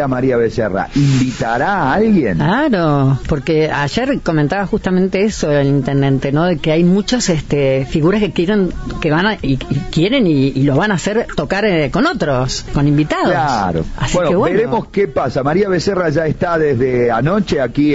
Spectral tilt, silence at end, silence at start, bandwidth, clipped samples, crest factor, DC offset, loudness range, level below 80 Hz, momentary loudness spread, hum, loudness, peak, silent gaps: -6.5 dB/octave; 0 s; 0 s; 8 kHz; under 0.1%; 10 dB; under 0.1%; 1 LU; -32 dBFS; 4 LU; none; -15 LUFS; -4 dBFS; none